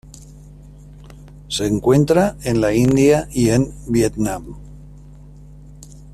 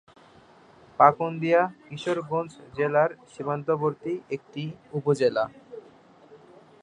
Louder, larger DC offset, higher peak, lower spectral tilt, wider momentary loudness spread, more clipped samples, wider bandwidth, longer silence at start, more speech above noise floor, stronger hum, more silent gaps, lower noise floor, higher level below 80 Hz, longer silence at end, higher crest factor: first, -17 LUFS vs -26 LUFS; neither; about the same, -2 dBFS vs -4 dBFS; about the same, -6 dB/octave vs -7 dB/octave; second, 11 LU vs 16 LU; neither; first, 14.5 kHz vs 10.5 kHz; second, 0.15 s vs 1 s; second, 24 dB vs 29 dB; first, 50 Hz at -35 dBFS vs none; neither; second, -40 dBFS vs -54 dBFS; first, -38 dBFS vs -70 dBFS; second, 0.05 s vs 0.45 s; second, 16 dB vs 24 dB